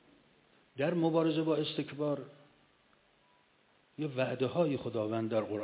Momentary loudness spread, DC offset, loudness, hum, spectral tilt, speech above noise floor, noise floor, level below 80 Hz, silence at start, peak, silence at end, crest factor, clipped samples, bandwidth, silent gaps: 11 LU; under 0.1%; -33 LUFS; none; -5.5 dB/octave; 36 dB; -69 dBFS; -74 dBFS; 0.75 s; -18 dBFS; 0 s; 16 dB; under 0.1%; 4 kHz; none